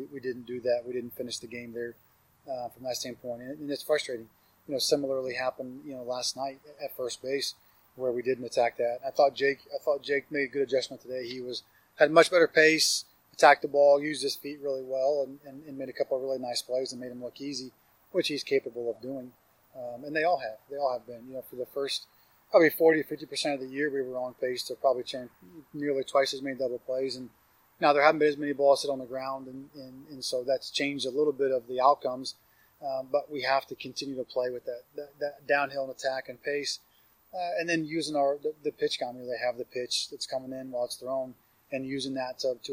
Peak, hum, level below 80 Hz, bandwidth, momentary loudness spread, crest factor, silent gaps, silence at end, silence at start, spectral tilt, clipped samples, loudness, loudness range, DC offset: -4 dBFS; none; -76 dBFS; 16 kHz; 17 LU; 26 dB; none; 0 s; 0 s; -3 dB/octave; under 0.1%; -29 LUFS; 9 LU; under 0.1%